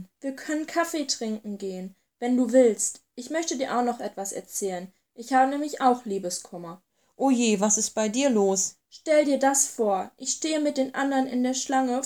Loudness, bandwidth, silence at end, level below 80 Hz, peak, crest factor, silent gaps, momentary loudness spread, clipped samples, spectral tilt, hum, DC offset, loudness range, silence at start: -25 LUFS; 18.5 kHz; 0 s; -76 dBFS; -8 dBFS; 18 dB; none; 14 LU; under 0.1%; -3 dB/octave; none; under 0.1%; 4 LU; 0 s